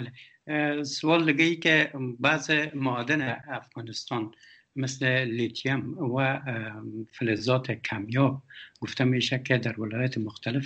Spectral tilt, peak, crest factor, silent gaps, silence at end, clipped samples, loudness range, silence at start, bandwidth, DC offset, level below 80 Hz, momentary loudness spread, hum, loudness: -5.5 dB/octave; -8 dBFS; 20 dB; none; 0 s; under 0.1%; 5 LU; 0 s; 8.6 kHz; under 0.1%; -68 dBFS; 14 LU; none; -27 LUFS